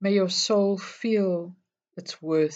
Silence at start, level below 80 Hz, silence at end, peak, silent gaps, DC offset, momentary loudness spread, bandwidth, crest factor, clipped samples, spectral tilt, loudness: 0 s; -84 dBFS; 0 s; -10 dBFS; none; under 0.1%; 18 LU; 8.8 kHz; 14 dB; under 0.1%; -4.5 dB/octave; -25 LUFS